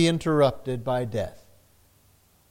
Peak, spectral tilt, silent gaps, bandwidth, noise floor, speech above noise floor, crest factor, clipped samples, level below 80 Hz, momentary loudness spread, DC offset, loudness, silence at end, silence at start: -8 dBFS; -6 dB/octave; none; 16.5 kHz; -61 dBFS; 37 dB; 18 dB; under 0.1%; -54 dBFS; 10 LU; under 0.1%; -25 LUFS; 1.1 s; 0 s